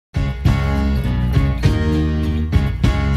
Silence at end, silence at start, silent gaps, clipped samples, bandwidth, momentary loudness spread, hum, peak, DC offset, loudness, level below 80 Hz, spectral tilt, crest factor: 0 s; 0.15 s; none; under 0.1%; 13 kHz; 2 LU; none; 0 dBFS; under 0.1%; -18 LUFS; -20 dBFS; -7.5 dB/octave; 16 dB